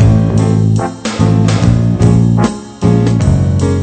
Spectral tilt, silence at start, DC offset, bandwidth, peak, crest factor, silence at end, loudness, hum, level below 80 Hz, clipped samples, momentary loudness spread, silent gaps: -7.5 dB/octave; 0 s; under 0.1%; 9 kHz; 0 dBFS; 10 dB; 0 s; -11 LUFS; none; -24 dBFS; 0.2%; 5 LU; none